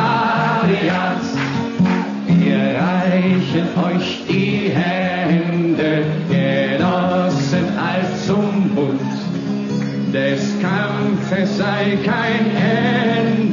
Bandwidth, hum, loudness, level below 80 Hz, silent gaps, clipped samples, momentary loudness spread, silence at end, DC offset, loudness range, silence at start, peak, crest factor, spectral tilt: 7.4 kHz; none; -17 LUFS; -58 dBFS; none; under 0.1%; 4 LU; 0 s; under 0.1%; 2 LU; 0 s; -4 dBFS; 12 dB; -7 dB/octave